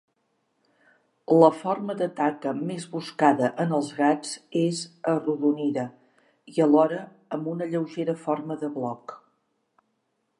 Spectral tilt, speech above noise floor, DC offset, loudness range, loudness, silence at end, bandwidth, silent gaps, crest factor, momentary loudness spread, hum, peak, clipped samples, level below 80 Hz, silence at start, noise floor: -6.5 dB/octave; 50 dB; under 0.1%; 3 LU; -25 LUFS; 1.25 s; 11 kHz; none; 22 dB; 13 LU; none; -4 dBFS; under 0.1%; -82 dBFS; 1.3 s; -75 dBFS